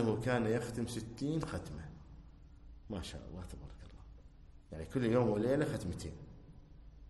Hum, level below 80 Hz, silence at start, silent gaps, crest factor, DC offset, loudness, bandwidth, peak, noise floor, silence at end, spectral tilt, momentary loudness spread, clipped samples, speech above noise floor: none; -54 dBFS; 0 s; none; 20 dB; under 0.1%; -37 LUFS; 12 kHz; -18 dBFS; -57 dBFS; 0 s; -6.5 dB/octave; 26 LU; under 0.1%; 21 dB